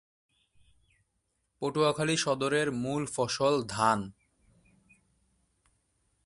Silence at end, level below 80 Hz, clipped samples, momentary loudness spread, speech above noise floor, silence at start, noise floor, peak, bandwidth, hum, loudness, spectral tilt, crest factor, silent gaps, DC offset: 2.15 s; -66 dBFS; under 0.1%; 6 LU; 50 dB; 1.6 s; -78 dBFS; -10 dBFS; 11.5 kHz; none; -29 LUFS; -4 dB/octave; 22 dB; none; under 0.1%